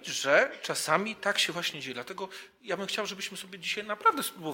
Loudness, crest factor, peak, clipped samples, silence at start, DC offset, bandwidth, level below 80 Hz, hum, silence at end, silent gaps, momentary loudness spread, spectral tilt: -29 LUFS; 22 dB; -8 dBFS; under 0.1%; 0 s; under 0.1%; 16.5 kHz; -78 dBFS; none; 0 s; none; 13 LU; -2 dB/octave